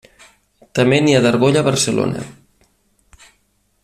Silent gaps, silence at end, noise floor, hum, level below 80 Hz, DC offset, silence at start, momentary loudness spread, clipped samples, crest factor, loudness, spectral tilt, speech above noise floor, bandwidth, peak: none; 1.5 s; -62 dBFS; 50 Hz at -55 dBFS; -52 dBFS; under 0.1%; 0.75 s; 13 LU; under 0.1%; 16 dB; -15 LUFS; -5 dB/octave; 48 dB; 14.5 kHz; -2 dBFS